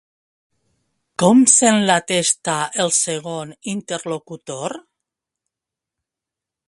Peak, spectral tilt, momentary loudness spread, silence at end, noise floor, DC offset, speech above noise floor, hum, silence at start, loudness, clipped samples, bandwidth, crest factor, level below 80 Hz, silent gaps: 0 dBFS; -3 dB/octave; 18 LU; 1.9 s; -86 dBFS; under 0.1%; 68 dB; none; 1.2 s; -17 LUFS; under 0.1%; 11.5 kHz; 20 dB; -66 dBFS; none